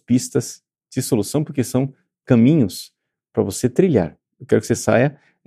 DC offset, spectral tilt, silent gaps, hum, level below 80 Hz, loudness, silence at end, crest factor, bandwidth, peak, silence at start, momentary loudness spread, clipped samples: under 0.1%; -6 dB/octave; none; none; -54 dBFS; -19 LUFS; 0.35 s; 18 dB; 15 kHz; -2 dBFS; 0.1 s; 12 LU; under 0.1%